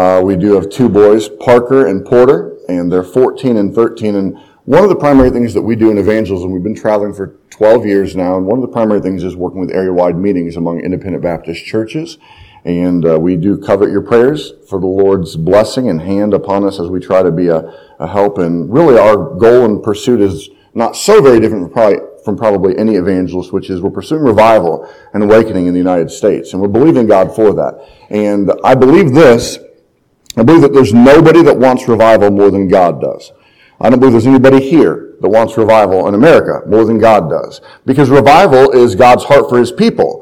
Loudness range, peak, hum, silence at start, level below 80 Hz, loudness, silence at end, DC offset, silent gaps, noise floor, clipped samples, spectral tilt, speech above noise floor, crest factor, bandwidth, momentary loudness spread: 6 LU; 0 dBFS; none; 0 s; -38 dBFS; -9 LUFS; 0 s; under 0.1%; none; -53 dBFS; 2%; -7 dB/octave; 44 dB; 10 dB; 14.5 kHz; 12 LU